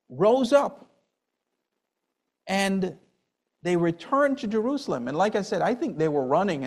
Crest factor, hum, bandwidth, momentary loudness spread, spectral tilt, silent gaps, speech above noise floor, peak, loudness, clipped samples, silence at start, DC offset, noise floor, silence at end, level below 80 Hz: 20 dB; none; 13.5 kHz; 7 LU; -6 dB/octave; none; 57 dB; -6 dBFS; -25 LUFS; under 0.1%; 0.1 s; under 0.1%; -82 dBFS; 0 s; -66 dBFS